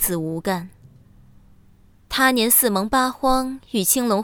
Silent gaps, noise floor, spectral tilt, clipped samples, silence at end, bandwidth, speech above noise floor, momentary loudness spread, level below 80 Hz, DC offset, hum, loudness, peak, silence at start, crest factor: none; -52 dBFS; -3 dB/octave; under 0.1%; 0 s; over 20 kHz; 32 dB; 11 LU; -44 dBFS; under 0.1%; none; -19 LUFS; -2 dBFS; 0 s; 18 dB